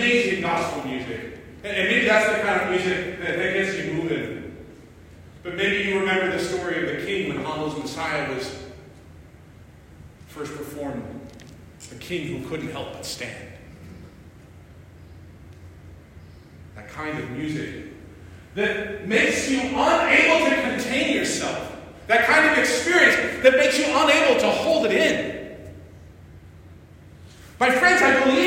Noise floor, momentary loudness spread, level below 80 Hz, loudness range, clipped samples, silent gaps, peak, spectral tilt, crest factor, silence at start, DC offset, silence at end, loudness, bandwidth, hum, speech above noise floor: -47 dBFS; 22 LU; -52 dBFS; 17 LU; under 0.1%; none; -2 dBFS; -3.5 dB/octave; 22 dB; 0 s; under 0.1%; 0 s; -21 LUFS; 16 kHz; none; 25 dB